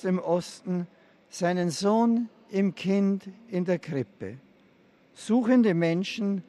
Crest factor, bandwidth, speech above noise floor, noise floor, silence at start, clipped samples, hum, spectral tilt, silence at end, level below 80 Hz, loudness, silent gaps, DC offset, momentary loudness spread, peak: 16 dB; 12 kHz; 34 dB; -60 dBFS; 0.05 s; under 0.1%; none; -6.5 dB/octave; 0.05 s; -74 dBFS; -27 LUFS; none; under 0.1%; 14 LU; -10 dBFS